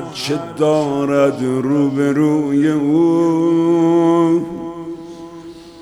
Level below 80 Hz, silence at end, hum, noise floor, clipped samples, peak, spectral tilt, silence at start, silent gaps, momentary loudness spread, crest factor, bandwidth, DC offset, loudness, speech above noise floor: -54 dBFS; 0 s; none; -35 dBFS; under 0.1%; -4 dBFS; -7 dB/octave; 0 s; none; 17 LU; 12 dB; 12 kHz; under 0.1%; -15 LUFS; 21 dB